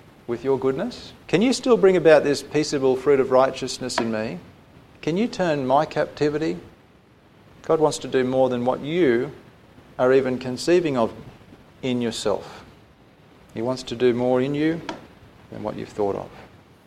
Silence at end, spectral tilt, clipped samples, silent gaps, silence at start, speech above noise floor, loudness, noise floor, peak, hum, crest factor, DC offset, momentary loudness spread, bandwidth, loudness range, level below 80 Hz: 0.4 s; -5.5 dB/octave; under 0.1%; none; 0.3 s; 32 dB; -22 LUFS; -53 dBFS; -2 dBFS; none; 22 dB; under 0.1%; 15 LU; 13 kHz; 7 LU; -56 dBFS